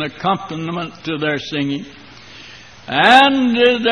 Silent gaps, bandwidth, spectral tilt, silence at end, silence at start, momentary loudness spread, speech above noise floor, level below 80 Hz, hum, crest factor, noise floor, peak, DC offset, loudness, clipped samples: none; 11 kHz; -5 dB/octave; 0 s; 0 s; 26 LU; 24 dB; -54 dBFS; none; 16 dB; -39 dBFS; 0 dBFS; 0.2%; -15 LUFS; under 0.1%